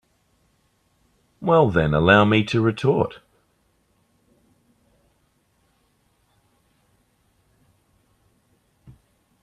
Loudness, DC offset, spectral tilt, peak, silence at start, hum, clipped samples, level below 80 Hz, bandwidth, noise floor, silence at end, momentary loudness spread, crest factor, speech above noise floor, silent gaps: -19 LUFS; under 0.1%; -7.5 dB/octave; 0 dBFS; 1.4 s; none; under 0.1%; -50 dBFS; 10.5 kHz; -66 dBFS; 6.3 s; 9 LU; 24 dB; 48 dB; none